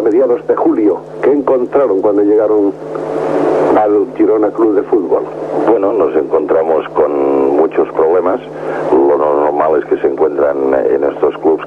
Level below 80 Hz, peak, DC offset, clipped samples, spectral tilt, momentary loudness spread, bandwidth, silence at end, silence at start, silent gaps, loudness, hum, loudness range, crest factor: -50 dBFS; 0 dBFS; under 0.1%; under 0.1%; -8 dB/octave; 5 LU; 6.4 kHz; 0 s; 0 s; none; -12 LUFS; none; 1 LU; 10 dB